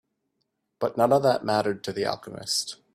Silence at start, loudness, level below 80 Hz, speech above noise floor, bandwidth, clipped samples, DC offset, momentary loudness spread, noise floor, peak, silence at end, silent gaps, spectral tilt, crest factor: 0.8 s; -25 LUFS; -68 dBFS; 52 dB; 15.5 kHz; under 0.1%; under 0.1%; 9 LU; -78 dBFS; -8 dBFS; 0.2 s; none; -4 dB/octave; 20 dB